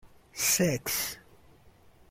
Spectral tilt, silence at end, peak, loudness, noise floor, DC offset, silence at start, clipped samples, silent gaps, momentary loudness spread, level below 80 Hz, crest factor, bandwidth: -3 dB/octave; 0.9 s; -14 dBFS; -28 LUFS; -58 dBFS; under 0.1%; 0.05 s; under 0.1%; none; 20 LU; -60 dBFS; 20 dB; 16.5 kHz